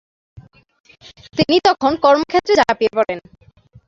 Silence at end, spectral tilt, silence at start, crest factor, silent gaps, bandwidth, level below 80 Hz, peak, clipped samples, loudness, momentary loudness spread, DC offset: 0.7 s; -5 dB/octave; 0.35 s; 18 dB; 0.80-0.84 s; 7.8 kHz; -50 dBFS; 0 dBFS; under 0.1%; -16 LUFS; 9 LU; under 0.1%